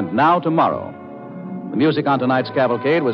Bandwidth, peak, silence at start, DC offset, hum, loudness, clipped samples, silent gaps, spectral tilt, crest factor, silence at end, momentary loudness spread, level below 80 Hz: 6 kHz; -6 dBFS; 0 s; under 0.1%; none; -18 LUFS; under 0.1%; none; -9 dB/octave; 14 dB; 0 s; 17 LU; -66 dBFS